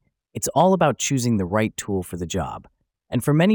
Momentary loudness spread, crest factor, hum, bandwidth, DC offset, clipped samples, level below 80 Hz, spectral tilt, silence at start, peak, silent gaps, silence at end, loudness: 11 LU; 18 dB; none; over 20 kHz; under 0.1%; under 0.1%; -52 dBFS; -5.5 dB/octave; 0.35 s; -4 dBFS; none; 0 s; -22 LUFS